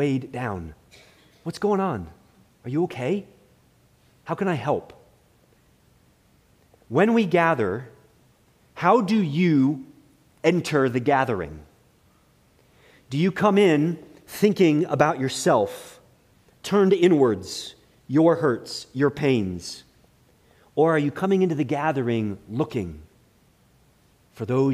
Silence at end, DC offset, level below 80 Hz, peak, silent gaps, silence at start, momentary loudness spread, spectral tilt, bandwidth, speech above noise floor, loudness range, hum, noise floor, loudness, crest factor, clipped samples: 0 s; under 0.1%; -58 dBFS; -4 dBFS; none; 0 s; 16 LU; -6.5 dB/octave; 15.5 kHz; 38 dB; 8 LU; none; -60 dBFS; -23 LUFS; 20 dB; under 0.1%